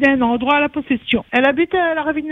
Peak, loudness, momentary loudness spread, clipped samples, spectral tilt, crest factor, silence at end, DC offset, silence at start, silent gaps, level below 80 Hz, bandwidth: 0 dBFS; -17 LUFS; 4 LU; under 0.1%; -6.5 dB/octave; 16 dB; 0 s; under 0.1%; 0 s; none; -48 dBFS; 6.8 kHz